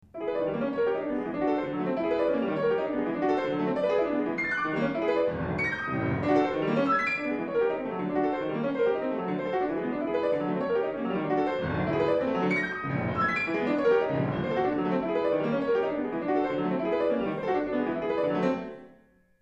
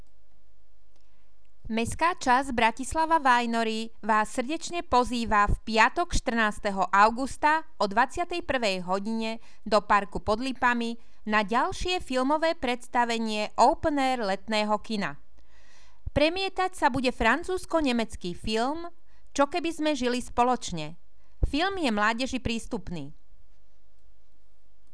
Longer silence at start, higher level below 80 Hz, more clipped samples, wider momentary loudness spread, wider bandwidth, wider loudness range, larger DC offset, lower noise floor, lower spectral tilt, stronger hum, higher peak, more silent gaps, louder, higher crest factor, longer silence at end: second, 0.15 s vs 1.65 s; second, -58 dBFS vs -42 dBFS; neither; second, 4 LU vs 10 LU; second, 7.8 kHz vs 11 kHz; about the same, 2 LU vs 4 LU; second, under 0.1% vs 1%; second, -60 dBFS vs -65 dBFS; first, -8 dB/octave vs -4 dB/octave; neither; second, -12 dBFS vs -8 dBFS; neither; about the same, -28 LUFS vs -26 LUFS; second, 14 dB vs 20 dB; second, 0.5 s vs 1.8 s